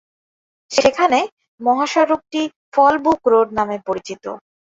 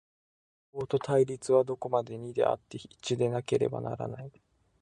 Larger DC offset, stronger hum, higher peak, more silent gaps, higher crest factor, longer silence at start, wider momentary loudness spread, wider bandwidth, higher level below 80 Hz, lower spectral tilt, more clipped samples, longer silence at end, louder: neither; neither; first, 0 dBFS vs -12 dBFS; first, 1.32-1.37 s, 1.48-1.58 s, 2.56-2.72 s vs none; about the same, 18 dB vs 20 dB; about the same, 0.7 s vs 0.75 s; about the same, 14 LU vs 14 LU; second, 8 kHz vs 11 kHz; first, -56 dBFS vs -66 dBFS; second, -3.5 dB/octave vs -6.5 dB/octave; neither; second, 0.4 s vs 0.55 s; first, -17 LUFS vs -30 LUFS